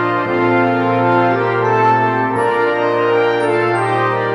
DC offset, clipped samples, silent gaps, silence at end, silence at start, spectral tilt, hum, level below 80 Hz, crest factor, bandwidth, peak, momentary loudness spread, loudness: under 0.1%; under 0.1%; none; 0 s; 0 s; -7 dB/octave; none; -58 dBFS; 12 dB; 10.5 kHz; -2 dBFS; 2 LU; -15 LUFS